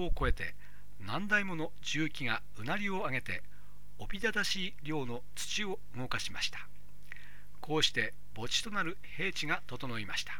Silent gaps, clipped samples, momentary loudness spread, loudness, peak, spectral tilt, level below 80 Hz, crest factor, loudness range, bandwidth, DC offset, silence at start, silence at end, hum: none; under 0.1%; 14 LU; -35 LUFS; -14 dBFS; -3 dB/octave; -46 dBFS; 22 dB; 2 LU; 18.5 kHz; 2%; 0 s; 0 s; 50 Hz at -55 dBFS